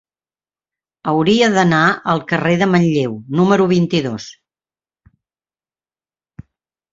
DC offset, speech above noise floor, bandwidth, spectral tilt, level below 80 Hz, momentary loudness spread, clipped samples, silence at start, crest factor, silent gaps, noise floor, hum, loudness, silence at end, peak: under 0.1%; over 75 dB; 7.8 kHz; -6 dB/octave; -54 dBFS; 10 LU; under 0.1%; 1.05 s; 16 dB; none; under -90 dBFS; none; -15 LUFS; 2.6 s; -2 dBFS